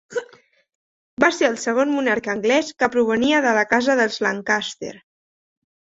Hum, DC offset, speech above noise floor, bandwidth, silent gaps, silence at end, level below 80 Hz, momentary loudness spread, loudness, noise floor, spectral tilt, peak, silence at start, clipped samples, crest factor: none; under 0.1%; 33 dB; 8 kHz; 0.75-1.17 s; 1 s; -62 dBFS; 13 LU; -19 LUFS; -53 dBFS; -3.5 dB/octave; -2 dBFS; 0.1 s; under 0.1%; 20 dB